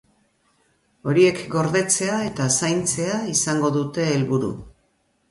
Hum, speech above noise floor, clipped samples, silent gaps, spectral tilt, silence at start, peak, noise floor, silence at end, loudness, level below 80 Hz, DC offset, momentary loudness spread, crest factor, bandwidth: none; 45 dB; under 0.1%; none; -4.5 dB/octave; 1.05 s; -6 dBFS; -66 dBFS; 0.6 s; -21 LUFS; -56 dBFS; under 0.1%; 6 LU; 18 dB; 12 kHz